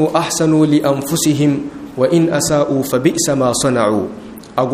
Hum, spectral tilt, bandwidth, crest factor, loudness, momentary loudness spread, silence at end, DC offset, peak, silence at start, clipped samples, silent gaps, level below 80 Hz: none; -5 dB/octave; 15.5 kHz; 14 dB; -15 LUFS; 9 LU; 0 s; under 0.1%; 0 dBFS; 0 s; under 0.1%; none; -48 dBFS